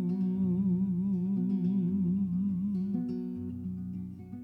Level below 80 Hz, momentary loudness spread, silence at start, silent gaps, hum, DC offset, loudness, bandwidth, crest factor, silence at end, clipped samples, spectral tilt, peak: -64 dBFS; 9 LU; 0 s; none; 60 Hz at -50 dBFS; under 0.1%; -31 LUFS; 2.3 kHz; 10 dB; 0 s; under 0.1%; -12 dB/octave; -22 dBFS